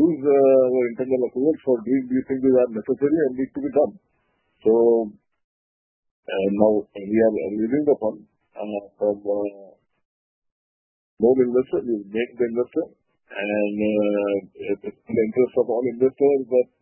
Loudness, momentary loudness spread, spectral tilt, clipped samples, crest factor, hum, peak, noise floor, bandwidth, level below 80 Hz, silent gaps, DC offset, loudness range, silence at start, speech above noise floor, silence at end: -22 LUFS; 11 LU; -11.5 dB/octave; under 0.1%; 20 dB; none; -2 dBFS; under -90 dBFS; 3.2 kHz; -60 dBFS; 5.44-6.03 s, 6.11-6.23 s, 10.05-10.42 s, 10.52-11.17 s; under 0.1%; 4 LU; 0 s; over 69 dB; 0.2 s